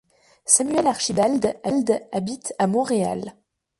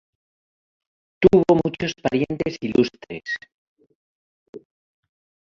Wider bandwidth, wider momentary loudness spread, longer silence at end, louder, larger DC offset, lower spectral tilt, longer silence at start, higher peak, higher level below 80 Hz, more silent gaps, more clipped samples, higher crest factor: first, 12 kHz vs 7.2 kHz; about the same, 12 LU vs 14 LU; second, 0.5 s vs 0.85 s; about the same, -21 LUFS vs -21 LUFS; neither; second, -4 dB/octave vs -7 dB/octave; second, 0.45 s vs 1.2 s; about the same, -2 dBFS vs -2 dBFS; second, -60 dBFS vs -52 dBFS; second, none vs 3.54-3.76 s, 3.95-4.53 s; neither; about the same, 20 dB vs 22 dB